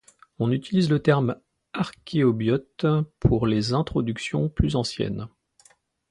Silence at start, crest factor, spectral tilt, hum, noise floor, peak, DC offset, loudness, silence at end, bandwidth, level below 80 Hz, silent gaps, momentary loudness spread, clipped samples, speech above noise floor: 0.4 s; 18 dB; -7 dB/octave; none; -60 dBFS; -6 dBFS; under 0.1%; -24 LUFS; 0.85 s; 11 kHz; -40 dBFS; none; 9 LU; under 0.1%; 37 dB